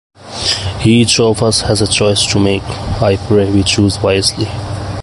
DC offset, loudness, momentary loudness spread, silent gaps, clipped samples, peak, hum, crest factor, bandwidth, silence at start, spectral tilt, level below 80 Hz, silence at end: under 0.1%; -12 LUFS; 9 LU; none; under 0.1%; 0 dBFS; none; 12 dB; 11.5 kHz; 0.2 s; -4.5 dB/octave; -30 dBFS; 0 s